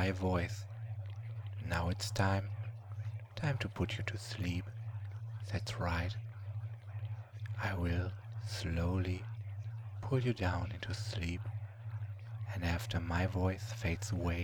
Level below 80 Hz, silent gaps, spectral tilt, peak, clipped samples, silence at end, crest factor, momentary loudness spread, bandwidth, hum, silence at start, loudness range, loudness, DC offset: -52 dBFS; none; -6 dB/octave; -18 dBFS; under 0.1%; 0 s; 20 dB; 10 LU; 18 kHz; none; 0 s; 3 LU; -39 LUFS; under 0.1%